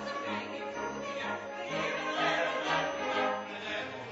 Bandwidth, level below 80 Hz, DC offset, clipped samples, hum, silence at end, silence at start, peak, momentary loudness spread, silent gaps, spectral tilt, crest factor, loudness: 7.6 kHz; -68 dBFS; under 0.1%; under 0.1%; none; 0 s; 0 s; -18 dBFS; 7 LU; none; -1 dB/octave; 16 dB; -33 LUFS